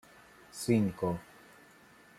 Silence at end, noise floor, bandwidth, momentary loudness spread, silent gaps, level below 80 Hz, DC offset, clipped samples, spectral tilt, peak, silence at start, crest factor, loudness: 0.95 s; -59 dBFS; 15.5 kHz; 20 LU; none; -66 dBFS; under 0.1%; under 0.1%; -6.5 dB/octave; -14 dBFS; 0.55 s; 20 dB; -32 LUFS